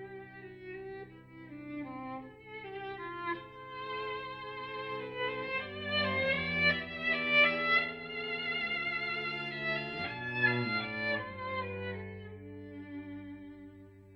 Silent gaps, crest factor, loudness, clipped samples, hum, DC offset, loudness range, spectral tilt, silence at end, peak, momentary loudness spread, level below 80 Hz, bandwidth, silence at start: none; 22 dB; -33 LUFS; under 0.1%; none; under 0.1%; 12 LU; -6.5 dB/octave; 0 s; -14 dBFS; 19 LU; -66 dBFS; 15 kHz; 0 s